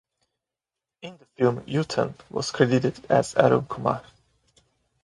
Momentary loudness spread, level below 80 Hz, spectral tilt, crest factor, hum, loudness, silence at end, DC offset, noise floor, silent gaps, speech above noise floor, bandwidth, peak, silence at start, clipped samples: 20 LU; -60 dBFS; -6 dB/octave; 24 dB; none; -24 LUFS; 1 s; under 0.1%; -88 dBFS; none; 65 dB; 11.5 kHz; -2 dBFS; 1.05 s; under 0.1%